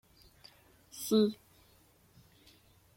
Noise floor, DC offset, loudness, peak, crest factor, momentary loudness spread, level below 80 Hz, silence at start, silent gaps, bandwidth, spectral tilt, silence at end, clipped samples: -65 dBFS; under 0.1%; -31 LUFS; -18 dBFS; 20 dB; 28 LU; -72 dBFS; 0.95 s; none; 16.5 kHz; -5.5 dB/octave; 1.6 s; under 0.1%